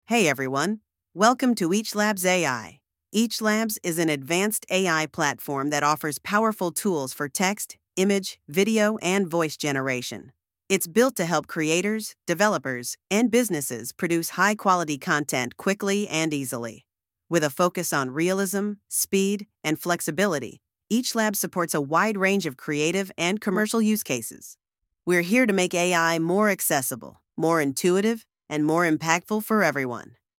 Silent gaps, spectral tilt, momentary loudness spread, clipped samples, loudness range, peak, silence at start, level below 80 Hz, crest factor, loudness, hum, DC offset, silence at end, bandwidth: none; -4 dB/octave; 8 LU; under 0.1%; 2 LU; -2 dBFS; 0.1 s; -70 dBFS; 22 dB; -24 LUFS; none; under 0.1%; 0.4 s; 18 kHz